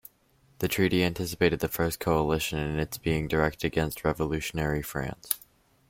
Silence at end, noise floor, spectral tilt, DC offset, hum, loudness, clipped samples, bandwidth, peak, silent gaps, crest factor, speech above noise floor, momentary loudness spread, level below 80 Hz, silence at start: 0.5 s; -64 dBFS; -5 dB/octave; under 0.1%; none; -28 LUFS; under 0.1%; 16.5 kHz; -4 dBFS; none; 26 dB; 36 dB; 6 LU; -46 dBFS; 0.6 s